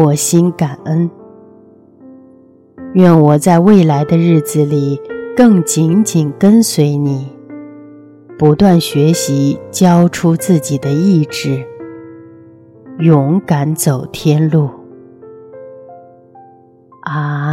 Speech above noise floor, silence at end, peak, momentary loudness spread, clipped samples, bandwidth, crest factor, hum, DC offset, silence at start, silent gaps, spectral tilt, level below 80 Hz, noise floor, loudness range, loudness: 33 dB; 0 s; 0 dBFS; 13 LU; under 0.1%; 16.5 kHz; 12 dB; none; under 0.1%; 0 s; none; -6.5 dB/octave; -48 dBFS; -44 dBFS; 5 LU; -12 LUFS